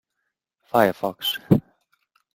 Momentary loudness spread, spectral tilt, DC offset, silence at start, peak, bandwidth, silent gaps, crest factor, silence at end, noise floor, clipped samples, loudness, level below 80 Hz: 6 LU; -6 dB/octave; under 0.1%; 0.75 s; -2 dBFS; 16.5 kHz; none; 22 dB; 0.75 s; -79 dBFS; under 0.1%; -22 LUFS; -56 dBFS